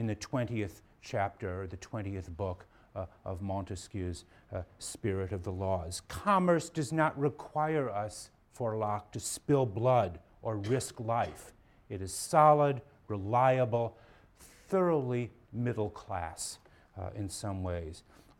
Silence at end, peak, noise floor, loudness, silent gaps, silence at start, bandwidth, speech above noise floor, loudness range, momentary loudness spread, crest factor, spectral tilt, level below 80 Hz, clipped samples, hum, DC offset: 0.4 s; -10 dBFS; -58 dBFS; -33 LUFS; none; 0 s; 17 kHz; 26 dB; 9 LU; 16 LU; 22 dB; -6 dB/octave; -58 dBFS; under 0.1%; none; under 0.1%